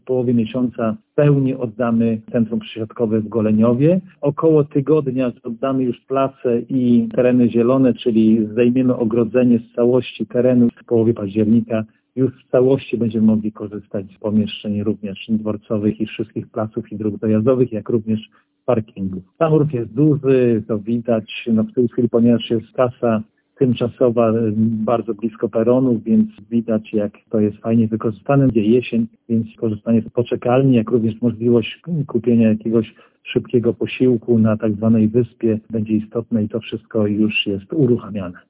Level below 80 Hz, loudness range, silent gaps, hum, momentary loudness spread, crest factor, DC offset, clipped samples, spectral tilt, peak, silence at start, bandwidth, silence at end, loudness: -52 dBFS; 4 LU; none; none; 9 LU; 16 dB; under 0.1%; under 0.1%; -12 dB/octave; -2 dBFS; 0.05 s; 3.9 kHz; 0.15 s; -18 LUFS